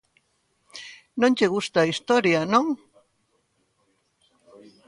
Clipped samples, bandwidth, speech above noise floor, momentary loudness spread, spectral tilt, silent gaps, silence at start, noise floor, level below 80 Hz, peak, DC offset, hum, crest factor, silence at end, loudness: under 0.1%; 11 kHz; 49 dB; 20 LU; -5 dB/octave; none; 0.75 s; -70 dBFS; -68 dBFS; -6 dBFS; under 0.1%; none; 20 dB; 2.15 s; -22 LUFS